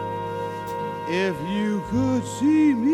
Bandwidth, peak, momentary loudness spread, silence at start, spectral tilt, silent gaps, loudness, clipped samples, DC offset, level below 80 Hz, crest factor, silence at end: 13.5 kHz; -10 dBFS; 11 LU; 0 s; -6.5 dB/octave; none; -24 LUFS; under 0.1%; under 0.1%; -52 dBFS; 12 dB; 0 s